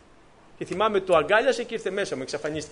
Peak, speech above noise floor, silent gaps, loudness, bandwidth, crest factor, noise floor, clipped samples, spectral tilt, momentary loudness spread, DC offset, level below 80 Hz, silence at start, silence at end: -8 dBFS; 29 dB; none; -25 LUFS; 10.5 kHz; 18 dB; -53 dBFS; under 0.1%; -4 dB/octave; 10 LU; under 0.1%; -58 dBFS; 0.6 s; 0 s